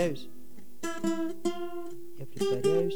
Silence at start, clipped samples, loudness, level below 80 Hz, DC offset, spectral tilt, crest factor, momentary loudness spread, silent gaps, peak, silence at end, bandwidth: 0 s; under 0.1%; -32 LUFS; -72 dBFS; 2%; -5.5 dB/octave; 16 dB; 18 LU; none; -14 dBFS; 0 s; over 20 kHz